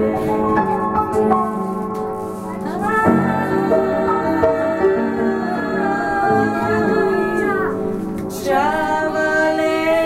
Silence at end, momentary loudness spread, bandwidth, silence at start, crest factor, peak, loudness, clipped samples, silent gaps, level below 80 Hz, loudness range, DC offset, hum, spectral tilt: 0 s; 7 LU; 16 kHz; 0 s; 18 dB; 0 dBFS; -18 LUFS; under 0.1%; none; -46 dBFS; 1 LU; under 0.1%; none; -6.5 dB/octave